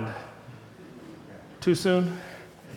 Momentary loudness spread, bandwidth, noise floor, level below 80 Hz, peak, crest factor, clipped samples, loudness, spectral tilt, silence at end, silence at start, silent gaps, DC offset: 23 LU; 16 kHz; -47 dBFS; -64 dBFS; -12 dBFS; 18 dB; under 0.1%; -27 LUFS; -6 dB/octave; 0 s; 0 s; none; under 0.1%